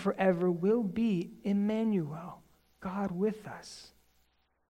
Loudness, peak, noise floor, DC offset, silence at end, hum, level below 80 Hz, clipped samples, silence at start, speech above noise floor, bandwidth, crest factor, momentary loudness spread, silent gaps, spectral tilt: -31 LUFS; -16 dBFS; -72 dBFS; under 0.1%; 0.85 s; none; -66 dBFS; under 0.1%; 0 s; 41 dB; 10.5 kHz; 18 dB; 17 LU; none; -8 dB/octave